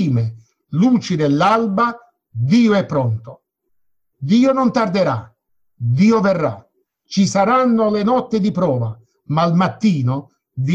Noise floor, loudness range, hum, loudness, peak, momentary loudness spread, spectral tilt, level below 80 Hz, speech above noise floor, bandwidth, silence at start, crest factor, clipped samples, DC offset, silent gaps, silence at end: -69 dBFS; 2 LU; none; -17 LUFS; -4 dBFS; 12 LU; -7 dB/octave; -54 dBFS; 53 dB; 8.4 kHz; 0 s; 14 dB; under 0.1%; under 0.1%; none; 0 s